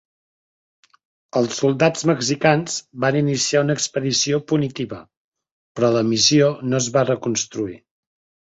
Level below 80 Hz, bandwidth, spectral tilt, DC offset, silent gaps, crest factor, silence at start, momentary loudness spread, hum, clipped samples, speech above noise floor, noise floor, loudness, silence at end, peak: -60 dBFS; 8.2 kHz; -4 dB/octave; under 0.1%; 5.17-5.32 s, 5.52-5.75 s; 18 dB; 1.35 s; 11 LU; none; under 0.1%; over 71 dB; under -90 dBFS; -19 LUFS; 0.7 s; -2 dBFS